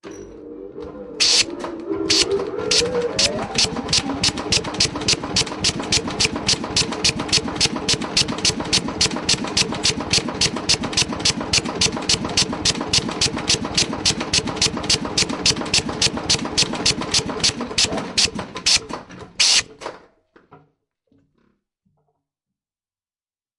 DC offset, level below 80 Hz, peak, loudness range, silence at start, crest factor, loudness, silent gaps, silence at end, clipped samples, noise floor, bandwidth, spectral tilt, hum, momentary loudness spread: under 0.1%; -42 dBFS; -2 dBFS; 1 LU; 0.05 s; 20 dB; -18 LUFS; none; 3 s; under 0.1%; under -90 dBFS; 12 kHz; -2 dB/octave; none; 5 LU